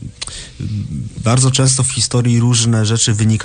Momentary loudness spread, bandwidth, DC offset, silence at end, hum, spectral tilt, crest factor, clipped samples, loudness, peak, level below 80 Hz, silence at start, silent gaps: 14 LU; 10 kHz; under 0.1%; 0 s; none; -4.5 dB/octave; 14 dB; under 0.1%; -14 LUFS; 0 dBFS; -38 dBFS; 0 s; none